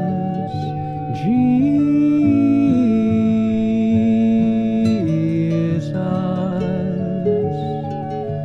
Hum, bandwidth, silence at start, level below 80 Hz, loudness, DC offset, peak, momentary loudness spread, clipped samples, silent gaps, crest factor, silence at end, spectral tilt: none; 7.8 kHz; 0 s; -48 dBFS; -18 LUFS; under 0.1%; -6 dBFS; 9 LU; under 0.1%; none; 12 dB; 0 s; -9.5 dB/octave